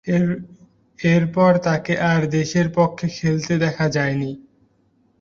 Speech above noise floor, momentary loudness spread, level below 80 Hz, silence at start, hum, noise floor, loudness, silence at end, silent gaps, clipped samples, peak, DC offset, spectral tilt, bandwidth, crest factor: 42 dB; 7 LU; -52 dBFS; 0.05 s; none; -61 dBFS; -20 LUFS; 0.8 s; none; under 0.1%; -4 dBFS; under 0.1%; -6.5 dB/octave; 7.2 kHz; 16 dB